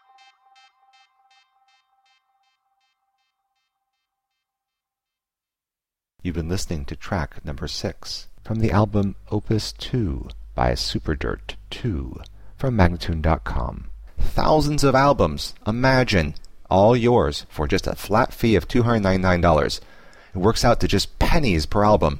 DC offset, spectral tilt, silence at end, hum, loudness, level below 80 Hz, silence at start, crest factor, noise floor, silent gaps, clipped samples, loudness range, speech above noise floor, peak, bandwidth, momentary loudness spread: under 0.1%; -6 dB/octave; 0 s; none; -22 LUFS; -32 dBFS; 6.2 s; 20 dB; -90 dBFS; none; under 0.1%; 11 LU; 70 dB; -2 dBFS; 16.5 kHz; 14 LU